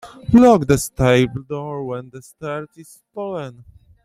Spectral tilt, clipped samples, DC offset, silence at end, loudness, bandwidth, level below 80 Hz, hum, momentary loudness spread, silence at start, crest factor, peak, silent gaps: -6 dB/octave; under 0.1%; under 0.1%; 0.5 s; -17 LUFS; 15.5 kHz; -42 dBFS; none; 20 LU; 0.05 s; 18 dB; -2 dBFS; none